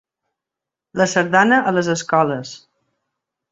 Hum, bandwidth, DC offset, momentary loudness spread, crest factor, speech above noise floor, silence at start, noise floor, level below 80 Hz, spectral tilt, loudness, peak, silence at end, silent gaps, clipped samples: none; 8 kHz; under 0.1%; 15 LU; 18 dB; 69 dB; 0.95 s; -86 dBFS; -62 dBFS; -4.5 dB/octave; -17 LUFS; -2 dBFS; 0.95 s; none; under 0.1%